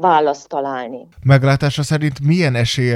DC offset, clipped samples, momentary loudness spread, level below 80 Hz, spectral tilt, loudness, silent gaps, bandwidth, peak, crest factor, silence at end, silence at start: under 0.1%; under 0.1%; 10 LU; -44 dBFS; -6 dB/octave; -16 LUFS; none; 12 kHz; 0 dBFS; 16 dB; 0 s; 0 s